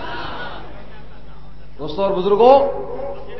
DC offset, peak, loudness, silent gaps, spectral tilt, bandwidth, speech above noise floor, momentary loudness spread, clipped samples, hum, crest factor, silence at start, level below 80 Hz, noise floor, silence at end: 4%; 0 dBFS; -17 LUFS; none; -7.5 dB/octave; 6 kHz; 25 dB; 21 LU; under 0.1%; none; 20 dB; 0 s; -42 dBFS; -40 dBFS; 0 s